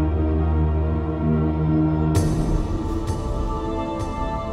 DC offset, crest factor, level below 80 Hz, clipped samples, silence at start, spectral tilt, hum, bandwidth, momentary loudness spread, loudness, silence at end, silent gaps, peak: under 0.1%; 14 dB; -26 dBFS; under 0.1%; 0 s; -8 dB/octave; none; 12.5 kHz; 6 LU; -23 LUFS; 0 s; none; -8 dBFS